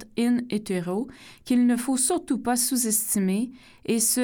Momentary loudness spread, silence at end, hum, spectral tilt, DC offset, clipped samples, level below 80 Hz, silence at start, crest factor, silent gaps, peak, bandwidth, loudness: 10 LU; 0 s; none; -3.5 dB/octave; under 0.1%; under 0.1%; -60 dBFS; 0 s; 14 dB; none; -10 dBFS; 19 kHz; -24 LUFS